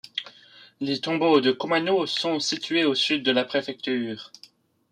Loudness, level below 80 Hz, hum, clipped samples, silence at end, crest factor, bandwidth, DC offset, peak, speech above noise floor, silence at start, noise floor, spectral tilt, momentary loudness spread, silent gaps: -24 LUFS; -74 dBFS; none; under 0.1%; 0.65 s; 18 dB; 11 kHz; under 0.1%; -6 dBFS; 31 dB; 0.15 s; -55 dBFS; -4 dB/octave; 13 LU; none